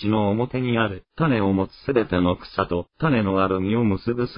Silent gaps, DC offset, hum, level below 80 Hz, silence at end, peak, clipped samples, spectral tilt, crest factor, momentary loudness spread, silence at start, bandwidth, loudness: none; under 0.1%; none; -48 dBFS; 0 s; -6 dBFS; under 0.1%; -12 dB/octave; 16 dB; 5 LU; 0 s; 5.4 kHz; -22 LUFS